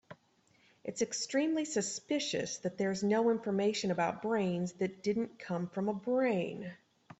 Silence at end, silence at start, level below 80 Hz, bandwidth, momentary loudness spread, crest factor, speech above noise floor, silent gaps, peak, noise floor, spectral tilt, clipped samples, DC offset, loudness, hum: 0.45 s; 0.1 s; -76 dBFS; 8.4 kHz; 7 LU; 14 dB; 36 dB; none; -20 dBFS; -70 dBFS; -4.5 dB/octave; under 0.1%; under 0.1%; -34 LUFS; none